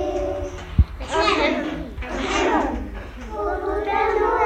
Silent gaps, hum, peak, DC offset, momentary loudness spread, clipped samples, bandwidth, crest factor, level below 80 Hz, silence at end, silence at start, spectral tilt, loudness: none; none; -4 dBFS; under 0.1%; 11 LU; under 0.1%; 9.4 kHz; 18 dB; -30 dBFS; 0 s; 0 s; -5.5 dB/octave; -23 LUFS